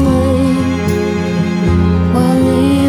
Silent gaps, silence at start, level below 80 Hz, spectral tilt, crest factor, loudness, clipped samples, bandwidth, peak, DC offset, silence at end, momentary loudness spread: none; 0 s; -28 dBFS; -7.5 dB/octave; 10 dB; -13 LUFS; under 0.1%; 14 kHz; -2 dBFS; under 0.1%; 0 s; 4 LU